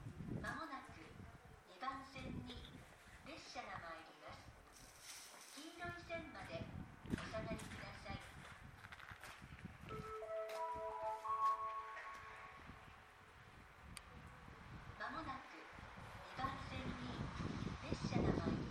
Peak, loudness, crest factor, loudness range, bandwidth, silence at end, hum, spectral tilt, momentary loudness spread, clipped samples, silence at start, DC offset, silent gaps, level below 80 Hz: -26 dBFS; -49 LUFS; 24 dB; 8 LU; 16.5 kHz; 0 s; none; -5.5 dB/octave; 16 LU; under 0.1%; 0 s; under 0.1%; none; -62 dBFS